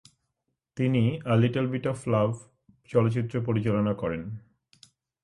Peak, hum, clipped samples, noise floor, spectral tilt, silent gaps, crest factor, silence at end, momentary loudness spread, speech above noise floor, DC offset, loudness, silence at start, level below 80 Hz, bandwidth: -10 dBFS; none; under 0.1%; -81 dBFS; -8 dB/octave; none; 18 dB; 0.85 s; 13 LU; 55 dB; under 0.1%; -27 LUFS; 0.75 s; -58 dBFS; 11.5 kHz